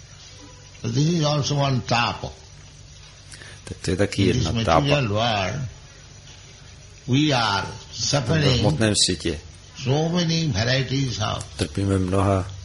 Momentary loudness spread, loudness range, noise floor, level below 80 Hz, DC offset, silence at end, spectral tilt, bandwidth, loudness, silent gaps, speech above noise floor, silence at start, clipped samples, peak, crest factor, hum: 22 LU; 3 LU; -44 dBFS; -42 dBFS; under 0.1%; 0 s; -5 dB/octave; 11.5 kHz; -22 LUFS; none; 23 dB; 0 s; under 0.1%; -2 dBFS; 20 dB; none